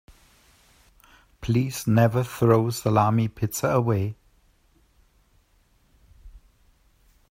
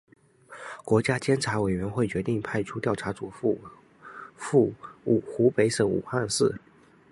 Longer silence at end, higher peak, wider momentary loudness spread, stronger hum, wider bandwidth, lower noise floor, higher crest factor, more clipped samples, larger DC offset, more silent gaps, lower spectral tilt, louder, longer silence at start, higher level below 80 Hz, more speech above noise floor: first, 0.95 s vs 0.55 s; about the same, -6 dBFS vs -8 dBFS; second, 7 LU vs 16 LU; neither; first, 16 kHz vs 11.5 kHz; first, -63 dBFS vs -47 dBFS; about the same, 20 dB vs 18 dB; neither; neither; neither; about the same, -6.5 dB/octave vs -5.5 dB/octave; first, -23 LUFS vs -26 LUFS; first, 1.4 s vs 0.5 s; about the same, -52 dBFS vs -56 dBFS; first, 41 dB vs 21 dB